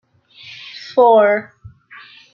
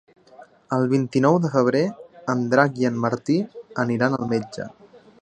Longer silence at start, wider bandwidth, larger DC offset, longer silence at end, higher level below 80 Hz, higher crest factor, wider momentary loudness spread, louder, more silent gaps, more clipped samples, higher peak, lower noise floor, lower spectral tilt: about the same, 0.5 s vs 0.4 s; second, 7 kHz vs 9.2 kHz; neither; first, 0.9 s vs 0.25 s; about the same, -60 dBFS vs -64 dBFS; about the same, 16 dB vs 20 dB; first, 23 LU vs 12 LU; first, -14 LUFS vs -22 LUFS; neither; neither; about the same, -2 dBFS vs -2 dBFS; second, -43 dBFS vs -49 dBFS; second, -5.5 dB/octave vs -7 dB/octave